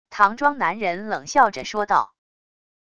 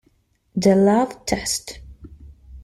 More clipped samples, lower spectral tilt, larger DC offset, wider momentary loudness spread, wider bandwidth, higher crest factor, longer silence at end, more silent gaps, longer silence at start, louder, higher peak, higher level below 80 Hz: neither; second, -3.5 dB/octave vs -5 dB/octave; first, 0.6% vs under 0.1%; second, 9 LU vs 18 LU; second, 10 kHz vs 15 kHz; about the same, 20 dB vs 18 dB; first, 0.8 s vs 0.05 s; neither; second, 0.1 s vs 0.55 s; about the same, -21 LUFS vs -20 LUFS; about the same, -2 dBFS vs -4 dBFS; second, -58 dBFS vs -44 dBFS